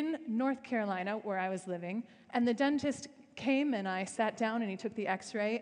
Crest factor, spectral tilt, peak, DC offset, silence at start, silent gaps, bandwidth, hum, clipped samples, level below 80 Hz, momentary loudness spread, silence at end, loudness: 16 dB; -5 dB/octave; -18 dBFS; under 0.1%; 0 s; none; 10.5 kHz; none; under 0.1%; -78 dBFS; 8 LU; 0 s; -35 LUFS